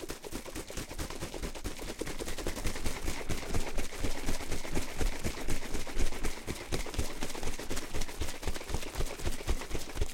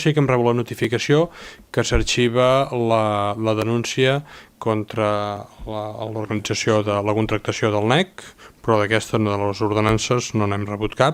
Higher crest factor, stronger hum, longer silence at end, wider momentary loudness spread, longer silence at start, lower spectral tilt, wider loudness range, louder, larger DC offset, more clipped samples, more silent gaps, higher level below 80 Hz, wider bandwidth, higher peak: about the same, 16 dB vs 20 dB; neither; about the same, 0 s vs 0 s; second, 4 LU vs 10 LU; about the same, 0 s vs 0 s; second, -4 dB/octave vs -5.5 dB/octave; about the same, 1 LU vs 3 LU; second, -38 LUFS vs -20 LUFS; neither; neither; neither; about the same, -36 dBFS vs -38 dBFS; about the same, 16.5 kHz vs 16 kHz; second, -16 dBFS vs 0 dBFS